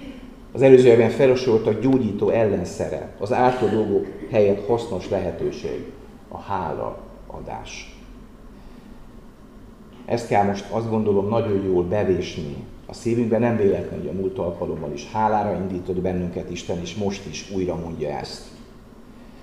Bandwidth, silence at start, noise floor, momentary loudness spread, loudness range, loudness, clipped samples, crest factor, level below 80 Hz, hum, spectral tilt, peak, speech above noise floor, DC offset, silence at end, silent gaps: 11 kHz; 0 s; -44 dBFS; 16 LU; 14 LU; -22 LUFS; under 0.1%; 22 dB; -46 dBFS; none; -7 dB/octave; 0 dBFS; 23 dB; 0.2%; 0 s; none